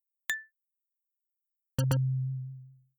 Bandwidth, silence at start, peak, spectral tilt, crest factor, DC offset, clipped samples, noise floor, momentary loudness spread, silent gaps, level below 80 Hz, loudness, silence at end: over 20 kHz; 0.3 s; -16 dBFS; -5.5 dB/octave; 18 dB; under 0.1%; under 0.1%; -87 dBFS; 14 LU; none; -62 dBFS; -33 LUFS; 0.25 s